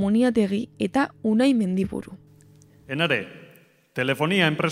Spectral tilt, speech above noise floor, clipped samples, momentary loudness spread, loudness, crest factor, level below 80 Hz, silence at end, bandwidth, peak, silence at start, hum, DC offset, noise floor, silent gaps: -6 dB/octave; 32 dB; under 0.1%; 14 LU; -23 LUFS; 20 dB; -56 dBFS; 0 s; 15.5 kHz; -4 dBFS; 0 s; none; under 0.1%; -54 dBFS; none